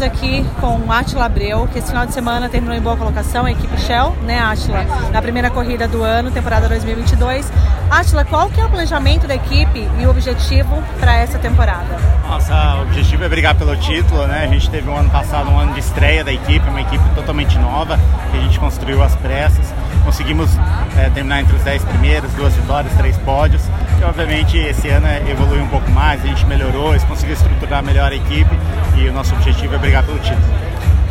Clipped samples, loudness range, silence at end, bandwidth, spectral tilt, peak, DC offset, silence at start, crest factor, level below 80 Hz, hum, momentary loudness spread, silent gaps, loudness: under 0.1%; 2 LU; 0 s; 14.5 kHz; -6 dB/octave; 0 dBFS; under 0.1%; 0 s; 12 dB; -16 dBFS; none; 4 LU; none; -15 LUFS